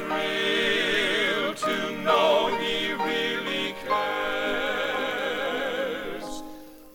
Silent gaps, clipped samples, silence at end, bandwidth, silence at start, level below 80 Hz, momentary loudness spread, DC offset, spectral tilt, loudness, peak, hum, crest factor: none; under 0.1%; 0 s; 19.5 kHz; 0 s; -56 dBFS; 10 LU; under 0.1%; -3 dB/octave; -25 LUFS; -10 dBFS; none; 16 dB